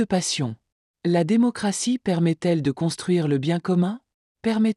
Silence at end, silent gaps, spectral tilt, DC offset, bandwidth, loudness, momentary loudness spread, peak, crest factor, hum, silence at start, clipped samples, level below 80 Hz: 0.05 s; 0.72-0.94 s, 4.14-4.35 s; -5.5 dB/octave; under 0.1%; 12 kHz; -23 LUFS; 9 LU; -10 dBFS; 12 dB; none; 0 s; under 0.1%; -62 dBFS